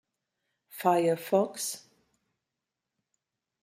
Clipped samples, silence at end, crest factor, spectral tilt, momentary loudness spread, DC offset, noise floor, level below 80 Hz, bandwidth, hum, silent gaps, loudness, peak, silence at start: under 0.1%; 1.85 s; 22 dB; -4.5 dB/octave; 15 LU; under 0.1%; -87 dBFS; -82 dBFS; 16 kHz; none; none; -28 LUFS; -10 dBFS; 0.75 s